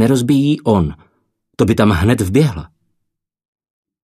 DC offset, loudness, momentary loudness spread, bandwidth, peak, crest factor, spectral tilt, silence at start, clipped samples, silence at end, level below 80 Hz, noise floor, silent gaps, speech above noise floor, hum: under 0.1%; -15 LUFS; 5 LU; 14 kHz; 0 dBFS; 16 dB; -7 dB/octave; 0 s; under 0.1%; 1.4 s; -36 dBFS; -73 dBFS; none; 59 dB; none